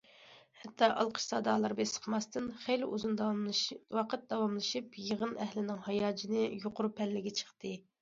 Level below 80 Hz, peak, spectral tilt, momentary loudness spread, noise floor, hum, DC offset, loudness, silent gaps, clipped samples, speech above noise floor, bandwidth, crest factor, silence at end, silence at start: -76 dBFS; -14 dBFS; -3.5 dB/octave; 7 LU; -60 dBFS; none; under 0.1%; -35 LUFS; none; under 0.1%; 25 dB; 7.6 kHz; 22 dB; 0.2 s; 0.2 s